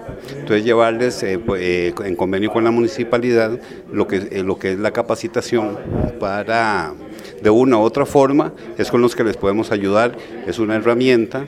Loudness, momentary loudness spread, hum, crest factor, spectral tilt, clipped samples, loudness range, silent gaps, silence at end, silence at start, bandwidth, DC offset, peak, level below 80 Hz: -18 LUFS; 9 LU; none; 18 dB; -6 dB/octave; under 0.1%; 4 LU; none; 0 s; 0 s; 13.5 kHz; under 0.1%; 0 dBFS; -44 dBFS